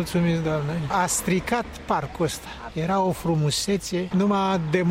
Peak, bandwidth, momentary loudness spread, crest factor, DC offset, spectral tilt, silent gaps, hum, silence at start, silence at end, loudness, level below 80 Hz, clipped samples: -8 dBFS; 16.5 kHz; 5 LU; 16 dB; under 0.1%; -5 dB/octave; none; none; 0 s; 0 s; -24 LUFS; -46 dBFS; under 0.1%